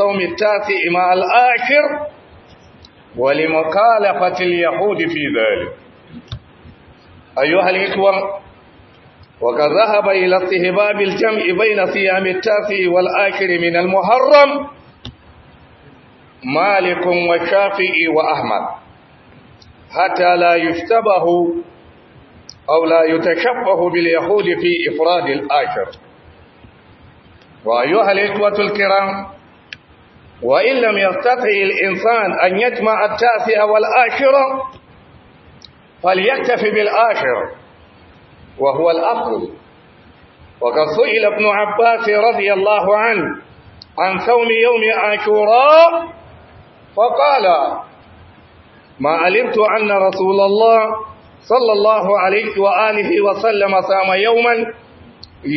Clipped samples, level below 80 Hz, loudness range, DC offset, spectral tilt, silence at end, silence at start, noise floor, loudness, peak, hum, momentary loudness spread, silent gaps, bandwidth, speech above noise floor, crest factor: under 0.1%; -54 dBFS; 5 LU; under 0.1%; -6 dB/octave; 0 s; 0 s; -46 dBFS; -14 LUFS; 0 dBFS; none; 10 LU; none; 6.2 kHz; 32 dB; 16 dB